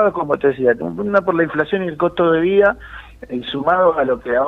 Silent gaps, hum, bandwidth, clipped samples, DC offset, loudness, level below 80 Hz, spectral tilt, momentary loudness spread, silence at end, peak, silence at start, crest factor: none; none; 4.9 kHz; under 0.1%; under 0.1%; -17 LUFS; -46 dBFS; -8 dB/octave; 13 LU; 0 s; -2 dBFS; 0 s; 14 dB